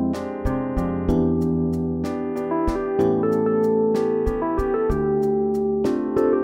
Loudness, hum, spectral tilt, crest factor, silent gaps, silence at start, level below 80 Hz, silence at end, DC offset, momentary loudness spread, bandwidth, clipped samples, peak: -22 LUFS; none; -9 dB/octave; 14 dB; none; 0 s; -34 dBFS; 0 s; under 0.1%; 5 LU; 15.5 kHz; under 0.1%; -8 dBFS